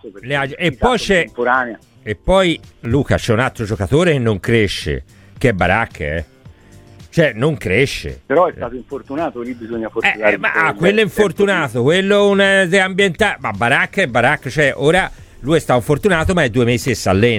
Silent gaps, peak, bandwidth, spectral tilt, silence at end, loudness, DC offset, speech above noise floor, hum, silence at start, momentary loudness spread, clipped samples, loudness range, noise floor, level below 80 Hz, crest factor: none; 0 dBFS; 16 kHz; -5.5 dB/octave; 0 s; -15 LUFS; under 0.1%; 27 dB; none; 0.05 s; 11 LU; under 0.1%; 5 LU; -42 dBFS; -36 dBFS; 16 dB